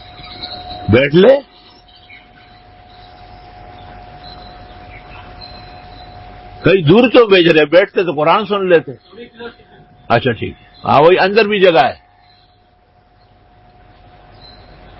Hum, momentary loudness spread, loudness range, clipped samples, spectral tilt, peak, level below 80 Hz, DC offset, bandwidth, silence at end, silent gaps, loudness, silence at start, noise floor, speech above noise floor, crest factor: none; 26 LU; 9 LU; under 0.1%; -8 dB/octave; 0 dBFS; -42 dBFS; under 0.1%; 5.8 kHz; 3.05 s; none; -11 LUFS; 0.2 s; -51 dBFS; 40 dB; 16 dB